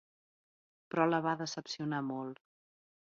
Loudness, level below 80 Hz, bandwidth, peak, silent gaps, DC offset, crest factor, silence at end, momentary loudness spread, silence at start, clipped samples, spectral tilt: -35 LUFS; -82 dBFS; 7.4 kHz; -16 dBFS; none; under 0.1%; 22 dB; 0.8 s; 13 LU; 0.95 s; under 0.1%; -4.5 dB/octave